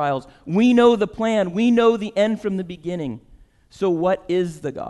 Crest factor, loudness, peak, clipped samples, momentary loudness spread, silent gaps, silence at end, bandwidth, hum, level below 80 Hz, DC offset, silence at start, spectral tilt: 16 dB; -20 LUFS; -4 dBFS; under 0.1%; 13 LU; none; 0 s; 10.5 kHz; none; -52 dBFS; under 0.1%; 0 s; -6.5 dB/octave